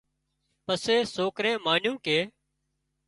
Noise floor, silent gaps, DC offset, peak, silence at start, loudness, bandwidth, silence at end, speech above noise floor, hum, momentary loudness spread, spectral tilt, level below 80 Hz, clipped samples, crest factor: -78 dBFS; none; under 0.1%; -10 dBFS; 0.7 s; -26 LUFS; 11.5 kHz; 0.8 s; 52 dB; none; 7 LU; -3.5 dB/octave; -68 dBFS; under 0.1%; 20 dB